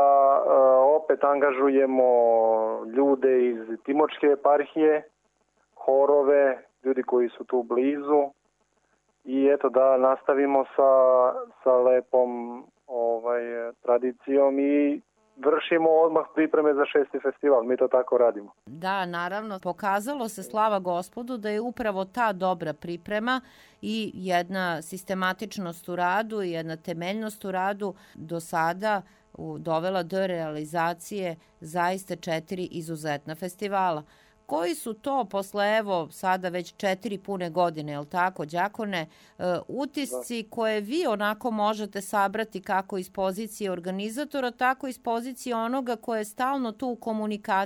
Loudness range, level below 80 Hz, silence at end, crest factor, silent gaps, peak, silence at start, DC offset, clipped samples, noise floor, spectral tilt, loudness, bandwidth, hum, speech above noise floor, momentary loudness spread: 7 LU; -70 dBFS; 0 s; 16 dB; none; -8 dBFS; 0 s; under 0.1%; under 0.1%; -70 dBFS; -5.5 dB/octave; -26 LUFS; 18.5 kHz; none; 45 dB; 12 LU